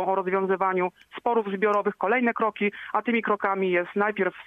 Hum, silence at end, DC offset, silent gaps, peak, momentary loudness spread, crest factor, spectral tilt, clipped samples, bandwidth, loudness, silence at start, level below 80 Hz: none; 0.05 s; under 0.1%; none; -10 dBFS; 4 LU; 16 dB; -7.5 dB/octave; under 0.1%; 6.4 kHz; -25 LUFS; 0 s; -72 dBFS